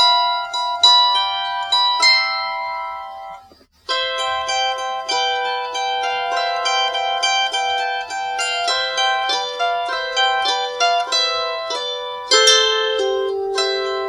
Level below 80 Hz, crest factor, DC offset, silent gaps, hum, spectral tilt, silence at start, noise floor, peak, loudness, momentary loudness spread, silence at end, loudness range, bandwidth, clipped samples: -60 dBFS; 18 dB; under 0.1%; none; none; 1.5 dB/octave; 0 s; -48 dBFS; 0 dBFS; -17 LUFS; 11 LU; 0 s; 5 LU; 16 kHz; under 0.1%